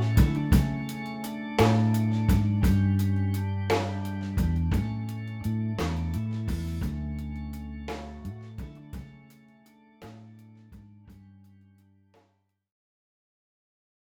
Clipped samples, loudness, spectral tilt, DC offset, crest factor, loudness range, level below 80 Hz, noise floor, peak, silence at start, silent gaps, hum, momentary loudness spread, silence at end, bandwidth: under 0.1%; -28 LUFS; -7.5 dB/octave; under 0.1%; 20 dB; 20 LU; -36 dBFS; -71 dBFS; -10 dBFS; 0 s; none; none; 18 LU; 3 s; 19.5 kHz